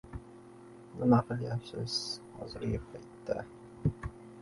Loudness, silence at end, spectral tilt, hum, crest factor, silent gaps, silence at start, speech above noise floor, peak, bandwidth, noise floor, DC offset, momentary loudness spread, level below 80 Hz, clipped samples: -34 LUFS; 0 s; -6.5 dB/octave; none; 22 dB; none; 0.05 s; 19 dB; -14 dBFS; 11.5 kHz; -52 dBFS; under 0.1%; 22 LU; -52 dBFS; under 0.1%